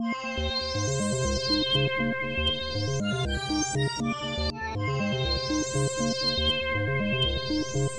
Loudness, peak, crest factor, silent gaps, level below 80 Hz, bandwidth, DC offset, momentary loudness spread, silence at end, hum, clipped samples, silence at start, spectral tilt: -27 LUFS; -14 dBFS; 14 dB; none; -40 dBFS; 11 kHz; under 0.1%; 5 LU; 0 s; none; under 0.1%; 0 s; -4 dB/octave